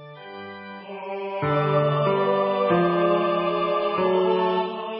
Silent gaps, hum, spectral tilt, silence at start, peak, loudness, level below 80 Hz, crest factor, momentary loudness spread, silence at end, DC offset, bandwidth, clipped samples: none; none; -11.5 dB/octave; 0 s; -10 dBFS; -22 LUFS; -62 dBFS; 14 dB; 17 LU; 0 s; under 0.1%; 5.6 kHz; under 0.1%